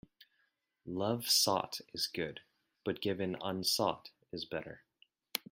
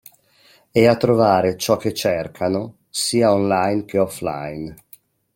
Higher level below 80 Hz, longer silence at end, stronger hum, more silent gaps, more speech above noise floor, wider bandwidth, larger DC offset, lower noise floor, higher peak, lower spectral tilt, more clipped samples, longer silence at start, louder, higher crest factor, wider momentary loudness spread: second, -74 dBFS vs -54 dBFS; second, 0.1 s vs 0.6 s; neither; neither; first, 43 dB vs 36 dB; about the same, 16 kHz vs 16.5 kHz; neither; first, -79 dBFS vs -55 dBFS; second, -16 dBFS vs -2 dBFS; second, -3 dB/octave vs -5 dB/octave; neither; about the same, 0.85 s vs 0.75 s; second, -35 LUFS vs -19 LUFS; about the same, 22 dB vs 18 dB; first, 19 LU vs 12 LU